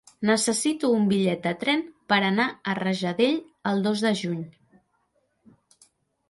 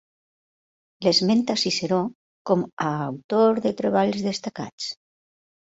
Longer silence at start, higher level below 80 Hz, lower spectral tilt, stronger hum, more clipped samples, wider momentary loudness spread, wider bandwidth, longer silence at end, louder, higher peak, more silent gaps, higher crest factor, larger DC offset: second, 0.2 s vs 1 s; about the same, -68 dBFS vs -66 dBFS; about the same, -4.5 dB/octave vs -5 dB/octave; neither; neither; second, 6 LU vs 13 LU; first, 11.5 kHz vs 8 kHz; first, 1.8 s vs 0.75 s; about the same, -24 LUFS vs -23 LUFS; about the same, -8 dBFS vs -6 dBFS; second, none vs 2.15-2.45 s, 2.73-2.77 s, 3.24-3.29 s, 4.73-4.78 s; about the same, 18 dB vs 18 dB; neither